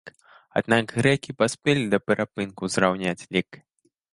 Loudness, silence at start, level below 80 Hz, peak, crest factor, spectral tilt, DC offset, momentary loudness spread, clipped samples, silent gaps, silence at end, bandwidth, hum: -24 LUFS; 0.05 s; -58 dBFS; -2 dBFS; 22 dB; -5 dB/octave; under 0.1%; 7 LU; under 0.1%; none; 0.6 s; 11.5 kHz; none